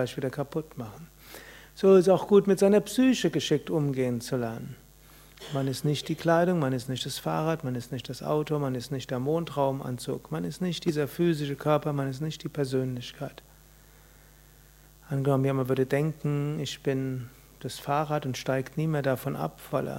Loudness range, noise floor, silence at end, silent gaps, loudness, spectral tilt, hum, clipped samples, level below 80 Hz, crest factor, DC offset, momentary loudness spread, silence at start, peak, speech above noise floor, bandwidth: 7 LU; -55 dBFS; 0 s; none; -28 LUFS; -6.5 dB/octave; none; under 0.1%; -58 dBFS; 20 dB; under 0.1%; 16 LU; 0 s; -8 dBFS; 27 dB; 16 kHz